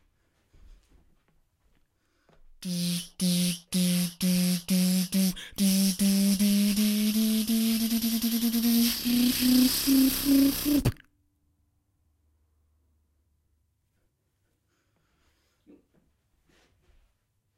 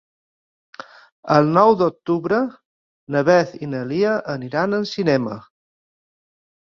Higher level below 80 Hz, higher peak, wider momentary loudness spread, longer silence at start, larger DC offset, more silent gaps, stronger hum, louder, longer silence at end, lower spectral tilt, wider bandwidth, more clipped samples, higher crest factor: first, -52 dBFS vs -60 dBFS; second, -10 dBFS vs 0 dBFS; second, 6 LU vs 19 LU; first, 2.6 s vs 0.8 s; neither; second, none vs 1.12-1.23 s, 2.65-3.07 s; neither; second, -25 LUFS vs -19 LUFS; first, 6.65 s vs 1.35 s; second, -4.5 dB/octave vs -7 dB/octave; first, 16 kHz vs 7.2 kHz; neither; about the same, 18 dB vs 20 dB